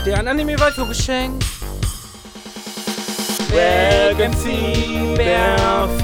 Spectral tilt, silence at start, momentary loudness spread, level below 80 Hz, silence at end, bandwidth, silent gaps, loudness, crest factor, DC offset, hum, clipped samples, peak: -4.5 dB/octave; 0 s; 14 LU; -26 dBFS; 0 s; over 20 kHz; none; -18 LUFS; 16 dB; under 0.1%; none; under 0.1%; -2 dBFS